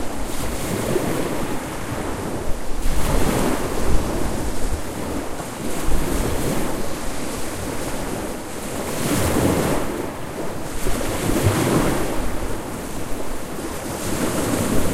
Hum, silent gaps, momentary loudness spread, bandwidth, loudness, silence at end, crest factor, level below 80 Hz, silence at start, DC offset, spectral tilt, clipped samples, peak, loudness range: none; none; 9 LU; 16 kHz; -24 LUFS; 0 s; 18 dB; -28 dBFS; 0 s; under 0.1%; -5 dB/octave; under 0.1%; -2 dBFS; 4 LU